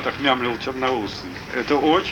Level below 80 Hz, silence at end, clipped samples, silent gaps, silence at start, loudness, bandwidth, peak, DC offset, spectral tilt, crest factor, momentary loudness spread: -48 dBFS; 0 s; under 0.1%; none; 0 s; -22 LUFS; 17.5 kHz; -4 dBFS; under 0.1%; -5 dB/octave; 18 dB; 11 LU